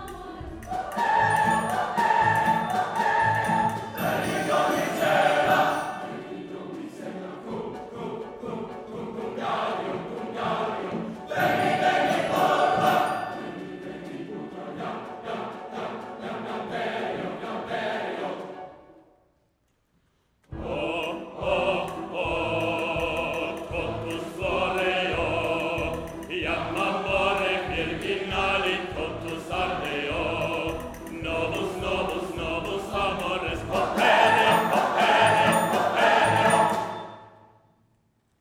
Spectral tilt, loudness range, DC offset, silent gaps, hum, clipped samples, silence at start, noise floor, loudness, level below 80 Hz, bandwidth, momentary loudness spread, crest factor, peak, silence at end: -4.5 dB/octave; 12 LU; under 0.1%; none; none; under 0.1%; 0 s; -70 dBFS; -25 LUFS; -48 dBFS; 19 kHz; 16 LU; 20 dB; -6 dBFS; 1.1 s